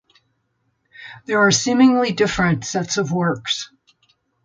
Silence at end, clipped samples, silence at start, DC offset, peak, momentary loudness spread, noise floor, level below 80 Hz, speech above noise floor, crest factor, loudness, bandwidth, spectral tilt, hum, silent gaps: 0.8 s; under 0.1%; 1 s; under 0.1%; -4 dBFS; 21 LU; -69 dBFS; -50 dBFS; 51 dB; 16 dB; -18 LUFS; 9.2 kHz; -4 dB/octave; none; none